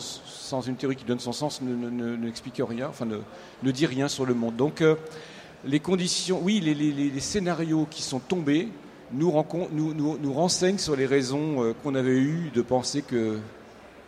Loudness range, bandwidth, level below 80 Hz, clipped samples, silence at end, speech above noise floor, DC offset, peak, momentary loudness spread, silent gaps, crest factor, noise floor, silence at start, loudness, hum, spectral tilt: 5 LU; 14.5 kHz; -60 dBFS; under 0.1%; 0 s; 22 dB; under 0.1%; -8 dBFS; 10 LU; none; 18 dB; -48 dBFS; 0 s; -27 LUFS; none; -5 dB/octave